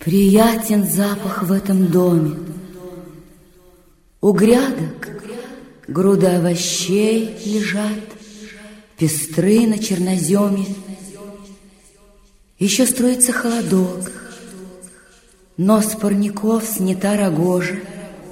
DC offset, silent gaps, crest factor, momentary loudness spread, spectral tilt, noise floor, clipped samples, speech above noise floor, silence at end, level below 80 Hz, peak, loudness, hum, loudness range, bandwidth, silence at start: under 0.1%; none; 18 dB; 22 LU; -5 dB/octave; -51 dBFS; under 0.1%; 35 dB; 0 s; -50 dBFS; 0 dBFS; -17 LUFS; none; 3 LU; 16.5 kHz; 0 s